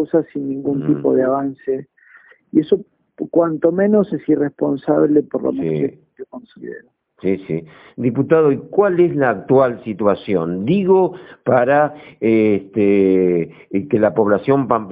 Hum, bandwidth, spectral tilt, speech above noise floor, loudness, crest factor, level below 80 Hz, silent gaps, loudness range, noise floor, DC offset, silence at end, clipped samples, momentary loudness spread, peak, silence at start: none; 4.8 kHz; -7.5 dB/octave; 32 dB; -17 LUFS; 16 dB; -58 dBFS; none; 5 LU; -48 dBFS; under 0.1%; 0 s; under 0.1%; 11 LU; 0 dBFS; 0 s